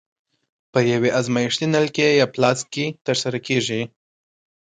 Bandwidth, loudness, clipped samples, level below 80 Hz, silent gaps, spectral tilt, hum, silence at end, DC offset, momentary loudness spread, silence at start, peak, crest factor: 9.6 kHz; -20 LUFS; under 0.1%; -62 dBFS; 3.01-3.05 s; -4.5 dB/octave; none; 0.85 s; under 0.1%; 8 LU; 0.75 s; -2 dBFS; 18 dB